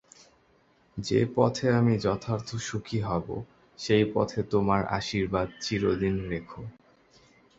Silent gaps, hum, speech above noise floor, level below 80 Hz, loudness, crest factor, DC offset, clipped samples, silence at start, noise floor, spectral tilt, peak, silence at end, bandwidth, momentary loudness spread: none; none; 37 dB; -52 dBFS; -28 LUFS; 22 dB; under 0.1%; under 0.1%; 0.95 s; -64 dBFS; -6 dB/octave; -8 dBFS; 0.85 s; 8 kHz; 15 LU